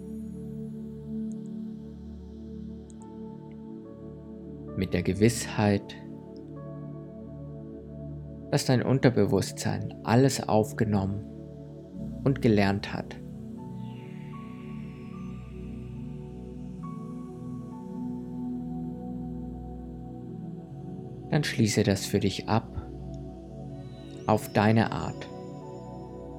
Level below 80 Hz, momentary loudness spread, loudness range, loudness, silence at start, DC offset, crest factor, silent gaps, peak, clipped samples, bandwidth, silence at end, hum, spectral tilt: -50 dBFS; 18 LU; 13 LU; -30 LUFS; 0 s; under 0.1%; 24 dB; none; -6 dBFS; under 0.1%; 17.5 kHz; 0 s; none; -6 dB/octave